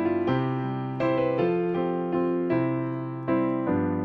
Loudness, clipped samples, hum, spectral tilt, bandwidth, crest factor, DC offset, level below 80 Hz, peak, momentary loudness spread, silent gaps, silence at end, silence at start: -26 LUFS; under 0.1%; none; -10 dB/octave; 5.2 kHz; 14 dB; under 0.1%; -60 dBFS; -12 dBFS; 5 LU; none; 0 s; 0 s